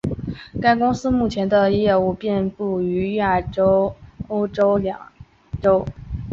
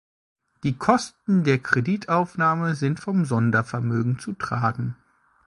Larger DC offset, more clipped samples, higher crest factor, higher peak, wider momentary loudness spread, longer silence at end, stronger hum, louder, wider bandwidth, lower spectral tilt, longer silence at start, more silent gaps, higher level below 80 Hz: neither; neither; about the same, 16 dB vs 20 dB; about the same, -4 dBFS vs -4 dBFS; first, 13 LU vs 8 LU; second, 0 s vs 0.55 s; neither; first, -20 LUFS vs -23 LUFS; second, 7.6 kHz vs 11.5 kHz; about the same, -7.5 dB/octave vs -7 dB/octave; second, 0.05 s vs 0.65 s; neither; first, -40 dBFS vs -58 dBFS